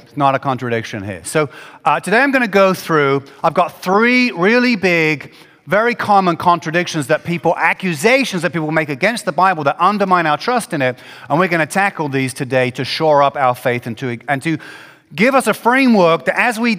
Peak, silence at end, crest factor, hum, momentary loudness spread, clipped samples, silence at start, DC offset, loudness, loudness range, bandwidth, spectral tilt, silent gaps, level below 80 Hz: 0 dBFS; 0 s; 16 dB; none; 8 LU; under 0.1%; 0.15 s; under 0.1%; -15 LUFS; 2 LU; 16.5 kHz; -5 dB/octave; none; -60 dBFS